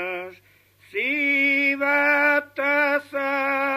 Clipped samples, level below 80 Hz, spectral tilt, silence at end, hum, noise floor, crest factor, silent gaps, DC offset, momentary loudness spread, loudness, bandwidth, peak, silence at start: under 0.1%; -74 dBFS; -4 dB/octave; 0 s; 50 Hz at -70 dBFS; -56 dBFS; 16 dB; none; under 0.1%; 12 LU; -20 LUFS; 15 kHz; -8 dBFS; 0 s